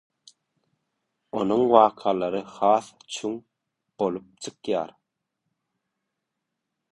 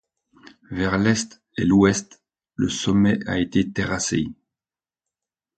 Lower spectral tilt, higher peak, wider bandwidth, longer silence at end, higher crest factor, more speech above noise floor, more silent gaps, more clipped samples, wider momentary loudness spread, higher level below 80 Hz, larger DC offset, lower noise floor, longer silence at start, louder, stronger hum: about the same, -5.5 dB/octave vs -5 dB/octave; about the same, -2 dBFS vs -4 dBFS; first, 11.5 kHz vs 9.2 kHz; first, 2.05 s vs 1.25 s; first, 26 dB vs 18 dB; second, 59 dB vs over 69 dB; neither; neither; first, 18 LU vs 12 LU; second, -68 dBFS vs -46 dBFS; neither; second, -82 dBFS vs under -90 dBFS; first, 1.35 s vs 0.7 s; about the same, -24 LUFS vs -22 LUFS; neither